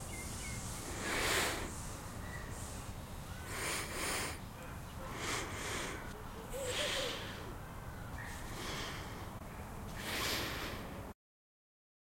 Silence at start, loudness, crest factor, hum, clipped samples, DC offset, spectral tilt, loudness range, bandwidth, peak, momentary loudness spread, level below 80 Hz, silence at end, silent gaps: 0 s; -40 LUFS; 22 dB; none; under 0.1%; under 0.1%; -3 dB/octave; 3 LU; 16.5 kHz; -20 dBFS; 12 LU; -52 dBFS; 1 s; none